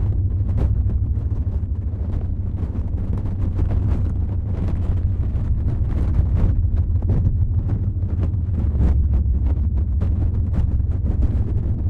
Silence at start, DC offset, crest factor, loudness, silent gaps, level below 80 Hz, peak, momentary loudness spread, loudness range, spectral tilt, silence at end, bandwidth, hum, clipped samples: 0 s; under 0.1%; 14 dB; -22 LUFS; none; -22 dBFS; -6 dBFS; 5 LU; 3 LU; -11 dB/octave; 0 s; 3 kHz; none; under 0.1%